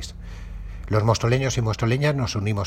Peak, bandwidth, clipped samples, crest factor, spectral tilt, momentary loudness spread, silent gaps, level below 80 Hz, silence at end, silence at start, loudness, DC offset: -4 dBFS; 13.5 kHz; under 0.1%; 18 dB; -5.5 dB/octave; 18 LU; none; -38 dBFS; 0 s; 0 s; -22 LUFS; under 0.1%